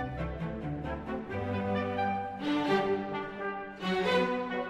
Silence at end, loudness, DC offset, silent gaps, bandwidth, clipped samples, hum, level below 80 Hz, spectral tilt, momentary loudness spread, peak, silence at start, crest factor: 0 s; -32 LUFS; under 0.1%; none; 12.5 kHz; under 0.1%; none; -50 dBFS; -6.5 dB/octave; 9 LU; -16 dBFS; 0 s; 16 dB